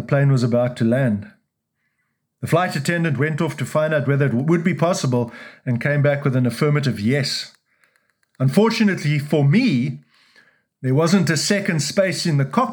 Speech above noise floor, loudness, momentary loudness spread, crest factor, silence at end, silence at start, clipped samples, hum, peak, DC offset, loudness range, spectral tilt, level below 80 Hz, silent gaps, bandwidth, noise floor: 55 dB; -19 LUFS; 7 LU; 18 dB; 0 s; 0 s; under 0.1%; none; -2 dBFS; under 0.1%; 2 LU; -6 dB/octave; -68 dBFS; none; 19.5 kHz; -73 dBFS